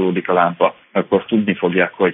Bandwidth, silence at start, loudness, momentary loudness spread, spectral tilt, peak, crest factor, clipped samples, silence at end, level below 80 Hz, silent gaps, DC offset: 3.9 kHz; 0 s; -17 LUFS; 3 LU; -11.5 dB/octave; -2 dBFS; 14 dB; under 0.1%; 0 s; -62 dBFS; none; under 0.1%